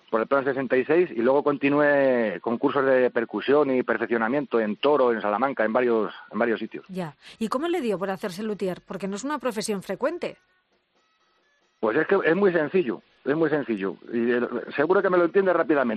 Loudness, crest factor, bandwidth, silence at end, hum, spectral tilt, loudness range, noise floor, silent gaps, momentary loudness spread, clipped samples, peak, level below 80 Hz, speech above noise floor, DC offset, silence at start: -24 LUFS; 18 dB; 13 kHz; 0 s; none; -6 dB/octave; 8 LU; -68 dBFS; none; 10 LU; under 0.1%; -6 dBFS; -70 dBFS; 45 dB; under 0.1%; 0.1 s